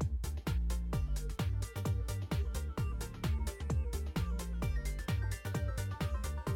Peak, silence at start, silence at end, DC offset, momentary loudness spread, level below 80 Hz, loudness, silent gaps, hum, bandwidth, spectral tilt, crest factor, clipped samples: -26 dBFS; 0 s; 0 s; under 0.1%; 2 LU; -38 dBFS; -38 LUFS; none; none; 17.5 kHz; -6 dB/octave; 10 dB; under 0.1%